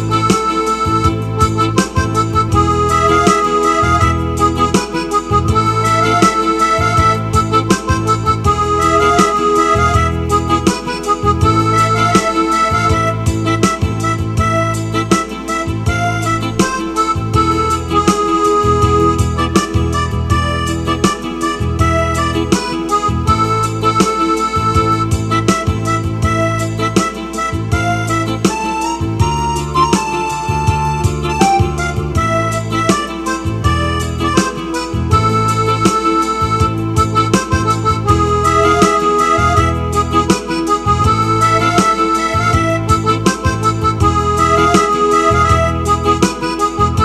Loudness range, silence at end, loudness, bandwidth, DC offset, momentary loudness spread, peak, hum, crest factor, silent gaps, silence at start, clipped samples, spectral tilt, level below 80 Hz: 3 LU; 0 s; -14 LUFS; 14 kHz; under 0.1%; 5 LU; 0 dBFS; none; 14 dB; none; 0 s; under 0.1%; -5.5 dB/octave; -28 dBFS